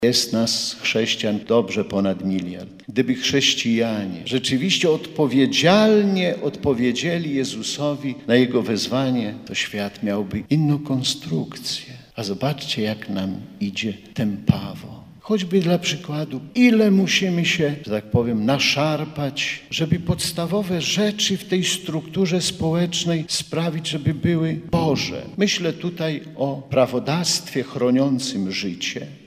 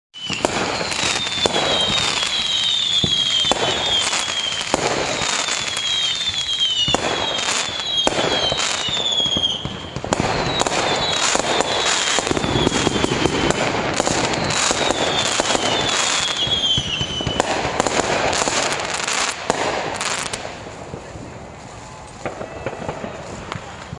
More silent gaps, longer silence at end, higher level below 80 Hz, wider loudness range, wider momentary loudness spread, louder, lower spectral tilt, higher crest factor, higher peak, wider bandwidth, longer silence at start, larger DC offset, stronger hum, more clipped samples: neither; about the same, 0.1 s vs 0 s; second, -52 dBFS vs -42 dBFS; about the same, 5 LU vs 7 LU; second, 9 LU vs 14 LU; second, -21 LUFS vs -18 LUFS; first, -4.5 dB/octave vs -2 dB/octave; about the same, 20 dB vs 20 dB; about the same, 0 dBFS vs 0 dBFS; first, 15.5 kHz vs 11.5 kHz; second, 0 s vs 0.15 s; neither; neither; neither